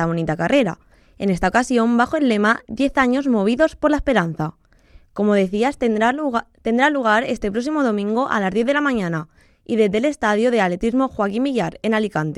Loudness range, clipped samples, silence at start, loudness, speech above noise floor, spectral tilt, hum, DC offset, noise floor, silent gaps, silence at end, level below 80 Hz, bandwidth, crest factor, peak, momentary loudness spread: 2 LU; under 0.1%; 0 s; -19 LUFS; 31 dB; -6 dB/octave; none; under 0.1%; -50 dBFS; none; 0 s; -44 dBFS; 11.5 kHz; 18 dB; -2 dBFS; 6 LU